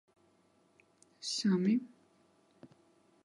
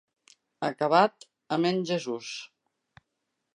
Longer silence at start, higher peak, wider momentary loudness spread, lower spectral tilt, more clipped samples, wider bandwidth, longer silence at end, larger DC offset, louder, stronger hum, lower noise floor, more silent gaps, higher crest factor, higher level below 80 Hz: first, 1.2 s vs 0.6 s; second, -20 dBFS vs -8 dBFS; about the same, 15 LU vs 16 LU; about the same, -5 dB/octave vs -5 dB/octave; neither; about the same, 11.5 kHz vs 10.5 kHz; second, 0.6 s vs 1.1 s; neither; second, -33 LUFS vs -27 LUFS; neither; second, -70 dBFS vs -81 dBFS; neither; about the same, 18 dB vs 22 dB; second, -86 dBFS vs -78 dBFS